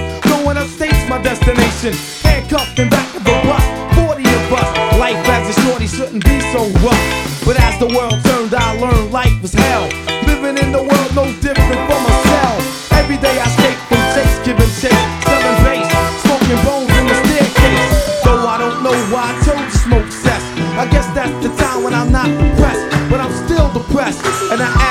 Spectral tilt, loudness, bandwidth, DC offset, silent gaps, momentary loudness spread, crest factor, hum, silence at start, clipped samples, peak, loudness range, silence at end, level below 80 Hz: -5 dB/octave; -13 LUFS; 17 kHz; under 0.1%; none; 5 LU; 12 dB; none; 0 s; 0.1%; 0 dBFS; 2 LU; 0 s; -18 dBFS